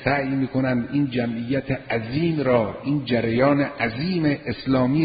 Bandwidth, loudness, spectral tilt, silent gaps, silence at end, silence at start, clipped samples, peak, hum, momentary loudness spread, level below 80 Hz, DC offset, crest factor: 5 kHz; -23 LUFS; -12 dB/octave; none; 0 s; 0 s; under 0.1%; -6 dBFS; none; 6 LU; -48 dBFS; under 0.1%; 16 dB